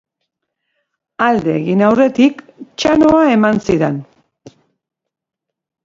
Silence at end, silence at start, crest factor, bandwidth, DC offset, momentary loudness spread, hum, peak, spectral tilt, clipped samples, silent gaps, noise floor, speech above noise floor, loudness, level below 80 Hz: 1.8 s; 1.2 s; 16 dB; 7.8 kHz; under 0.1%; 9 LU; none; 0 dBFS; -6.5 dB/octave; under 0.1%; none; -81 dBFS; 69 dB; -13 LUFS; -48 dBFS